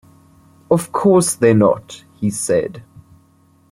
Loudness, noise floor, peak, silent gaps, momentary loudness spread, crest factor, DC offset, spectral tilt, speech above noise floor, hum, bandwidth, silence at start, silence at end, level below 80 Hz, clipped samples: -16 LUFS; -53 dBFS; -2 dBFS; none; 12 LU; 16 dB; under 0.1%; -5.5 dB/octave; 38 dB; none; 16 kHz; 0.7 s; 0.9 s; -54 dBFS; under 0.1%